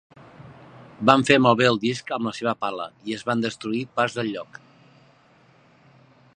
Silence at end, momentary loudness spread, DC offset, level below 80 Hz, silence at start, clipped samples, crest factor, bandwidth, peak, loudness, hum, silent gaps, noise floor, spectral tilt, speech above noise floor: 1.9 s; 14 LU; under 0.1%; -64 dBFS; 0.4 s; under 0.1%; 24 dB; 10.5 kHz; 0 dBFS; -22 LUFS; none; none; -56 dBFS; -5 dB/octave; 34 dB